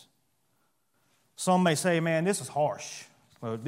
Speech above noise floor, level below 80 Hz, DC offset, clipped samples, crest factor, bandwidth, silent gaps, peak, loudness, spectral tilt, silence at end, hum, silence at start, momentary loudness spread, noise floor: 47 dB; -76 dBFS; under 0.1%; under 0.1%; 20 dB; 16 kHz; none; -10 dBFS; -28 LUFS; -5 dB/octave; 0 s; none; 1.4 s; 17 LU; -74 dBFS